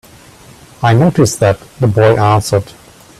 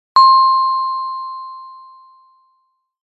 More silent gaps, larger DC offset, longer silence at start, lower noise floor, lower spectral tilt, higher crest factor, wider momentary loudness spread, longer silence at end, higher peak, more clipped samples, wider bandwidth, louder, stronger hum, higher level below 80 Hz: neither; neither; first, 0.8 s vs 0.15 s; second, -39 dBFS vs -65 dBFS; first, -6 dB/octave vs 0.5 dB/octave; about the same, 12 dB vs 16 dB; second, 7 LU vs 22 LU; second, 0.5 s vs 1.3 s; about the same, 0 dBFS vs -2 dBFS; neither; first, 14 kHz vs 7.8 kHz; about the same, -12 LUFS vs -13 LUFS; neither; first, -42 dBFS vs -70 dBFS